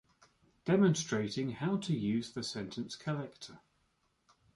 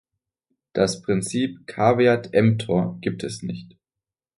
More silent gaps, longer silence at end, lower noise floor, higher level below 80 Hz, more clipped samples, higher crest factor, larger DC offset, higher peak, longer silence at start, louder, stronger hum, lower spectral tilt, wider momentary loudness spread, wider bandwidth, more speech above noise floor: neither; first, 1 s vs 0.75 s; second, -76 dBFS vs -89 dBFS; second, -70 dBFS vs -56 dBFS; neither; about the same, 18 dB vs 20 dB; neither; second, -18 dBFS vs -4 dBFS; about the same, 0.65 s vs 0.75 s; second, -34 LUFS vs -22 LUFS; neither; about the same, -5.5 dB/octave vs -6 dB/octave; first, 15 LU vs 12 LU; about the same, 11.5 kHz vs 11.5 kHz; second, 42 dB vs 67 dB